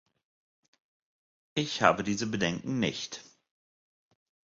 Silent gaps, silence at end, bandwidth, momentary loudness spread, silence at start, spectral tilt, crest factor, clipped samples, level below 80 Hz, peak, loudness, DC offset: none; 1.3 s; 7.8 kHz; 13 LU; 1.55 s; -4.5 dB/octave; 28 dB; under 0.1%; -64 dBFS; -6 dBFS; -30 LUFS; under 0.1%